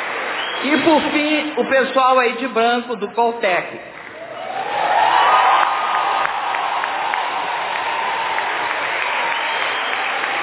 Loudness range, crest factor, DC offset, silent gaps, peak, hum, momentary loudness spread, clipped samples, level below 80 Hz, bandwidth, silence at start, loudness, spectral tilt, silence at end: 3 LU; 18 dB; under 0.1%; none; 0 dBFS; none; 8 LU; under 0.1%; -62 dBFS; 4 kHz; 0 s; -18 LUFS; -7 dB/octave; 0 s